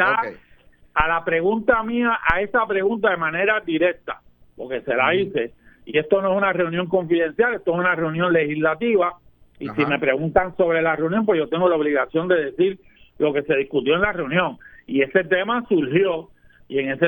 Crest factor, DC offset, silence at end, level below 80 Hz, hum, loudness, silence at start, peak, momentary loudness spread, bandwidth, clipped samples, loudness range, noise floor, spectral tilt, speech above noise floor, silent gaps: 18 dB; under 0.1%; 0 s; -46 dBFS; none; -21 LUFS; 0 s; -2 dBFS; 7 LU; 19 kHz; under 0.1%; 2 LU; -52 dBFS; -9 dB/octave; 31 dB; none